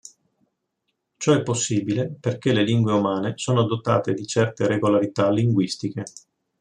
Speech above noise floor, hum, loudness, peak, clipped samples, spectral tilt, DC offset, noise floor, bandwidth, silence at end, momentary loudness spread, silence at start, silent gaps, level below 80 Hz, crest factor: 55 dB; none; -22 LUFS; -4 dBFS; under 0.1%; -5.5 dB/octave; under 0.1%; -77 dBFS; 10.5 kHz; 0.4 s; 7 LU; 1.2 s; none; -62 dBFS; 18 dB